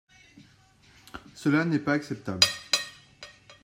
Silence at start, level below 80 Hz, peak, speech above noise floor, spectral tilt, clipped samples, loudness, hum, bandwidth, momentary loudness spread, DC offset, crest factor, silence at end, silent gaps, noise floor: 1.15 s; -66 dBFS; -2 dBFS; 33 dB; -3.5 dB/octave; under 0.1%; -26 LUFS; none; 16 kHz; 24 LU; under 0.1%; 28 dB; 0.1 s; none; -59 dBFS